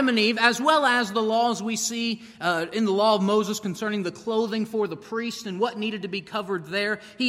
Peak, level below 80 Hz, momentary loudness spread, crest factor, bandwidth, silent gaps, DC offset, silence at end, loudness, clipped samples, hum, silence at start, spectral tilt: -4 dBFS; -70 dBFS; 10 LU; 20 dB; 16 kHz; none; under 0.1%; 0 s; -24 LUFS; under 0.1%; none; 0 s; -3.5 dB/octave